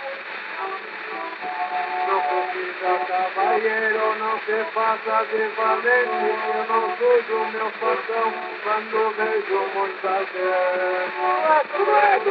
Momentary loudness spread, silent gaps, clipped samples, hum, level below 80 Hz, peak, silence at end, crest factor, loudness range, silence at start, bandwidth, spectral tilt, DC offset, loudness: 10 LU; none; under 0.1%; none; -88 dBFS; -4 dBFS; 0 s; 18 dB; 3 LU; 0 s; 5.8 kHz; 0 dB/octave; under 0.1%; -22 LUFS